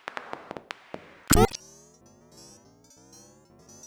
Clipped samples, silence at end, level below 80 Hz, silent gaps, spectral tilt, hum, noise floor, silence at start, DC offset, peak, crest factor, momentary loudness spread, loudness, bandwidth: under 0.1%; 2.3 s; -38 dBFS; none; -4 dB/octave; none; -56 dBFS; 0.15 s; under 0.1%; -8 dBFS; 24 dB; 29 LU; -26 LUFS; over 20 kHz